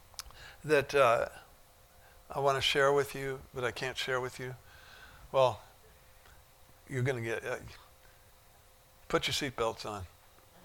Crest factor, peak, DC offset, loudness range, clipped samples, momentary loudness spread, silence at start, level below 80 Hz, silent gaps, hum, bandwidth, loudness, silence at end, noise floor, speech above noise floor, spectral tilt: 22 dB; -12 dBFS; under 0.1%; 8 LU; under 0.1%; 24 LU; 0.25 s; -60 dBFS; none; none; 19 kHz; -32 LUFS; 0.55 s; -61 dBFS; 29 dB; -4 dB/octave